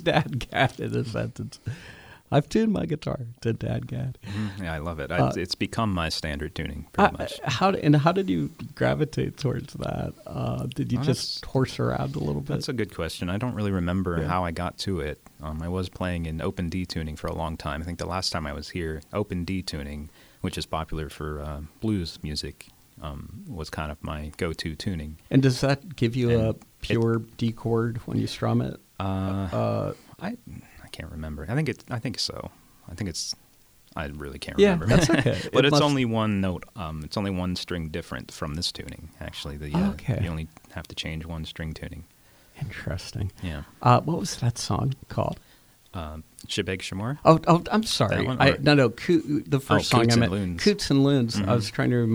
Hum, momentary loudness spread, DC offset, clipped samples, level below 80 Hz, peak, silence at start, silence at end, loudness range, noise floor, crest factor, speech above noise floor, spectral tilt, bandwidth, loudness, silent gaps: none; 15 LU; under 0.1%; under 0.1%; -44 dBFS; -2 dBFS; 0 s; 0 s; 10 LU; -57 dBFS; 24 dB; 31 dB; -6 dB/octave; over 20 kHz; -26 LUFS; none